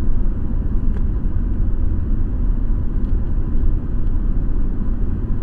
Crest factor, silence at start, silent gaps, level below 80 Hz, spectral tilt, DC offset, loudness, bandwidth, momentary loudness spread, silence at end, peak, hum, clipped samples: 12 dB; 0 s; none; -18 dBFS; -11.5 dB/octave; under 0.1%; -24 LUFS; 1.9 kHz; 2 LU; 0 s; -4 dBFS; none; under 0.1%